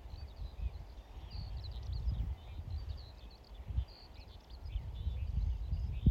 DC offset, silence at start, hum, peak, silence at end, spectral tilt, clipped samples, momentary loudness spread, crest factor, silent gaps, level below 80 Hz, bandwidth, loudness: under 0.1%; 0 s; none; -18 dBFS; 0 s; -8 dB/octave; under 0.1%; 14 LU; 22 dB; none; -42 dBFS; 6.6 kHz; -43 LUFS